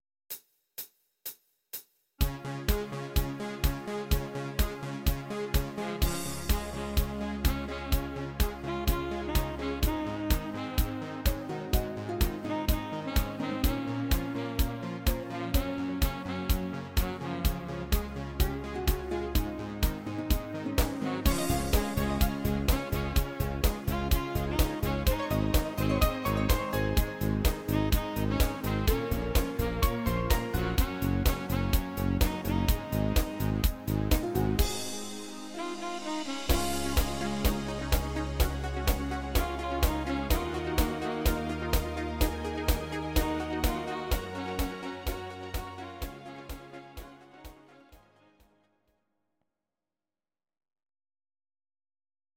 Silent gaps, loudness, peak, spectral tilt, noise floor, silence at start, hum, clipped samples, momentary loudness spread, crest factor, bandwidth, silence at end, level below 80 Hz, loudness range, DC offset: none; -31 LUFS; -12 dBFS; -5 dB/octave; under -90 dBFS; 0.3 s; none; under 0.1%; 8 LU; 20 dB; 17 kHz; 4.4 s; -34 dBFS; 5 LU; under 0.1%